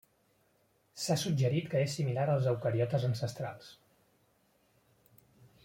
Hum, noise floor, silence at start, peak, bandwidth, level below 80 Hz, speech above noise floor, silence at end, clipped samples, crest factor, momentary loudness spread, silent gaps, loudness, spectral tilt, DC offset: none; -72 dBFS; 0.95 s; -18 dBFS; 16.5 kHz; -70 dBFS; 40 dB; 1.9 s; under 0.1%; 16 dB; 12 LU; none; -32 LUFS; -6 dB/octave; under 0.1%